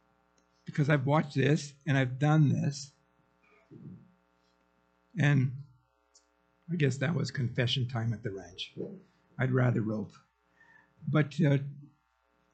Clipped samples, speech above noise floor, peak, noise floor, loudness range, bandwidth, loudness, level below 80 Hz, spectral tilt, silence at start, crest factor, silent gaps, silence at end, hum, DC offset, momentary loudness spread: under 0.1%; 44 dB; -12 dBFS; -73 dBFS; 6 LU; 8.6 kHz; -30 LUFS; -68 dBFS; -6.5 dB/octave; 0.65 s; 20 dB; none; 0.7 s; none; under 0.1%; 18 LU